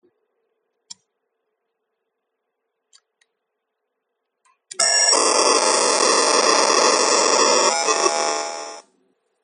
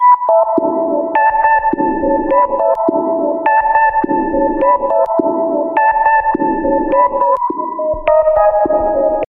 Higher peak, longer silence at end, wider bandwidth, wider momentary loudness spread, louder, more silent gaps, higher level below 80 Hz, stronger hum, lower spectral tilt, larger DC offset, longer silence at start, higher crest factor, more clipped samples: about the same, 0 dBFS vs 0 dBFS; first, 0.65 s vs 0.05 s; first, 11.5 kHz vs 3.6 kHz; first, 11 LU vs 5 LU; second, -16 LUFS vs -13 LUFS; neither; second, -78 dBFS vs -38 dBFS; neither; second, 1 dB/octave vs -9 dB/octave; neither; first, 4.8 s vs 0 s; first, 22 dB vs 12 dB; neither